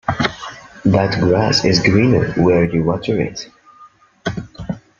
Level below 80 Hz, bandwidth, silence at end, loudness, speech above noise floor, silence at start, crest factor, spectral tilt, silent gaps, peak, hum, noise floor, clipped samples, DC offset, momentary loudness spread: -42 dBFS; 7.4 kHz; 0.2 s; -16 LUFS; 32 dB; 0.05 s; 16 dB; -6 dB/octave; none; -2 dBFS; none; -46 dBFS; under 0.1%; under 0.1%; 16 LU